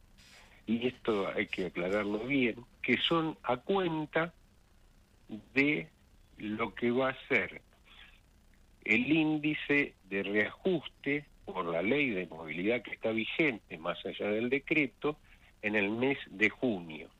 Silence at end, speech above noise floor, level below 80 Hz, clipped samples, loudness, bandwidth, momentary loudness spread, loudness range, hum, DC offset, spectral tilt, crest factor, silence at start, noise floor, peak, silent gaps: 0.15 s; 30 dB; -64 dBFS; under 0.1%; -32 LUFS; 10 kHz; 10 LU; 3 LU; none; under 0.1%; -6.5 dB/octave; 20 dB; 0.35 s; -62 dBFS; -12 dBFS; none